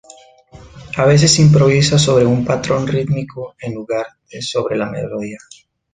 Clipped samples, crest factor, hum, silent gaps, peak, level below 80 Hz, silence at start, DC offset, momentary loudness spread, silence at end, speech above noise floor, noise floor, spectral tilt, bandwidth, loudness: under 0.1%; 16 dB; none; none; 0 dBFS; -44 dBFS; 0.55 s; under 0.1%; 18 LU; 0.55 s; 29 dB; -44 dBFS; -5 dB/octave; 9.6 kHz; -14 LUFS